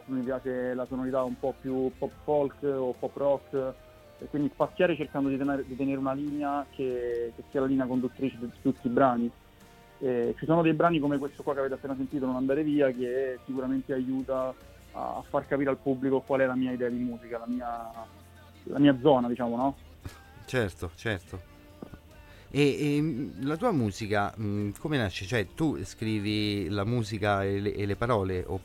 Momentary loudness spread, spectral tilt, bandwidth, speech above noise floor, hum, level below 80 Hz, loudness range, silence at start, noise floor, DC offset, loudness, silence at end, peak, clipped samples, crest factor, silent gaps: 11 LU; -7 dB/octave; 16 kHz; 25 dB; none; -56 dBFS; 3 LU; 0 s; -54 dBFS; under 0.1%; -29 LUFS; 0 s; -8 dBFS; under 0.1%; 20 dB; none